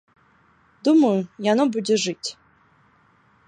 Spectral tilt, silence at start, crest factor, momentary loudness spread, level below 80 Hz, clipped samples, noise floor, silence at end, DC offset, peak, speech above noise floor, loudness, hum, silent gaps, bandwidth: -5 dB/octave; 0.85 s; 16 dB; 11 LU; -72 dBFS; under 0.1%; -59 dBFS; 1.15 s; under 0.1%; -8 dBFS; 39 dB; -21 LUFS; none; none; 10 kHz